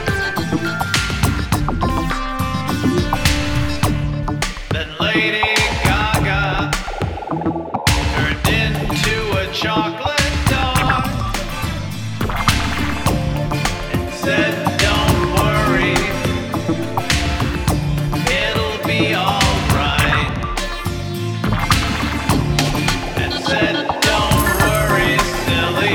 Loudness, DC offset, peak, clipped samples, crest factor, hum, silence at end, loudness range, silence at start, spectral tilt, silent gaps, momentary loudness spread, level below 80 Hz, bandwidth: -18 LUFS; under 0.1%; -2 dBFS; under 0.1%; 16 dB; none; 0 s; 2 LU; 0 s; -4.5 dB/octave; none; 7 LU; -26 dBFS; 19 kHz